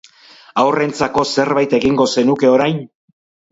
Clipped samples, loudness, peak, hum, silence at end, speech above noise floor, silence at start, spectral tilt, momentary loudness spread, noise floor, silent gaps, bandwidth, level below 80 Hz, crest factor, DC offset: under 0.1%; -15 LUFS; 0 dBFS; none; 0.65 s; 30 dB; 0.55 s; -5 dB/octave; 5 LU; -44 dBFS; none; 8 kHz; -50 dBFS; 16 dB; under 0.1%